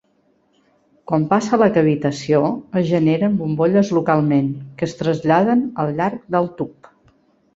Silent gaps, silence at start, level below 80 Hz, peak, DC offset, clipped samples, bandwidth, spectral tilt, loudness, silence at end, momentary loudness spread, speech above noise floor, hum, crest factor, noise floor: none; 1.1 s; -56 dBFS; -2 dBFS; under 0.1%; under 0.1%; 8 kHz; -7.5 dB/octave; -18 LUFS; 0.85 s; 8 LU; 44 dB; none; 16 dB; -61 dBFS